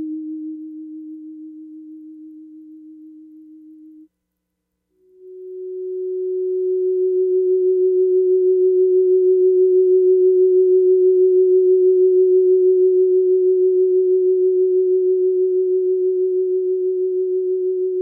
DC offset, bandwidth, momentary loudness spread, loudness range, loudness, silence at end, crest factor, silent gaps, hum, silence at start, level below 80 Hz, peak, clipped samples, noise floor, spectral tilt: under 0.1%; 0.5 kHz; 16 LU; 15 LU; -16 LUFS; 0 s; 8 dB; none; none; 0 s; -86 dBFS; -8 dBFS; under 0.1%; -76 dBFS; -12.5 dB/octave